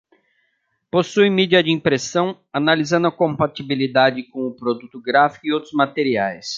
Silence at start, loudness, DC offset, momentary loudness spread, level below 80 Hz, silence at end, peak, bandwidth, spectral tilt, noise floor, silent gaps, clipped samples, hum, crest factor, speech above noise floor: 0.95 s; -19 LUFS; under 0.1%; 9 LU; -60 dBFS; 0 s; -2 dBFS; 7.6 kHz; -5 dB/octave; -69 dBFS; none; under 0.1%; none; 18 dB; 50 dB